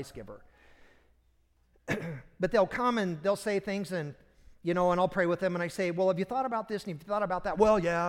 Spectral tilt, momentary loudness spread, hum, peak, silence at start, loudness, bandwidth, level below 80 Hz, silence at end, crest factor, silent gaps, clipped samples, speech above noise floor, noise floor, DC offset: -6 dB/octave; 11 LU; none; -10 dBFS; 0 s; -30 LUFS; 16.5 kHz; -56 dBFS; 0 s; 20 dB; none; under 0.1%; 38 dB; -68 dBFS; under 0.1%